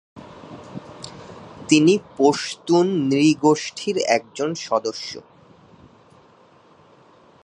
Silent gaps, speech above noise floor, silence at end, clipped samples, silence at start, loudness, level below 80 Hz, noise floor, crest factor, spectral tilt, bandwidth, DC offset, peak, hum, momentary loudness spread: none; 33 dB; 2.25 s; under 0.1%; 0.15 s; -20 LUFS; -64 dBFS; -52 dBFS; 20 dB; -5 dB/octave; 10.5 kHz; under 0.1%; -2 dBFS; none; 22 LU